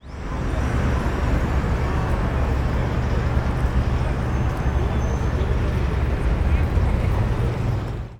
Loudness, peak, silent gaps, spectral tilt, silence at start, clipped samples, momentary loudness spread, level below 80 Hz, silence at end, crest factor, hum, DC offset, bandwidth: -23 LUFS; -8 dBFS; none; -7.5 dB/octave; 0.05 s; under 0.1%; 2 LU; -24 dBFS; 0 s; 12 dB; none; under 0.1%; 10 kHz